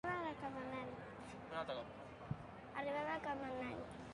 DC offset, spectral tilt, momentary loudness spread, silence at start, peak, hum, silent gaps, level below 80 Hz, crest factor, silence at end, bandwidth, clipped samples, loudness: under 0.1%; -6.5 dB/octave; 10 LU; 0.05 s; -28 dBFS; none; none; -68 dBFS; 18 dB; 0 s; 11 kHz; under 0.1%; -47 LUFS